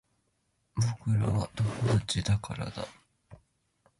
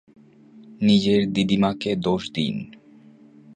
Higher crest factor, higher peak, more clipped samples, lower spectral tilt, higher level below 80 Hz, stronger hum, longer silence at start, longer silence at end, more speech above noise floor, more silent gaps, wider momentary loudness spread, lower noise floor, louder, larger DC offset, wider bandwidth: about the same, 16 dB vs 16 dB; second, -16 dBFS vs -6 dBFS; neither; about the same, -5.5 dB/octave vs -6.5 dB/octave; about the same, -50 dBFS vs -54 dBFS; neither; first, 0.75 s vs 0.55 s; second, 0.65 s vs 0.85 s; first, 46 dB vs 29 dB; neither; about the same, 11 LU vs 9 LU; first, -75 dBFS vs -50 dBFS; second, -31 LUFS vs -22 LUFS; neither; first, 11.5 kHz vs 9.4 kHz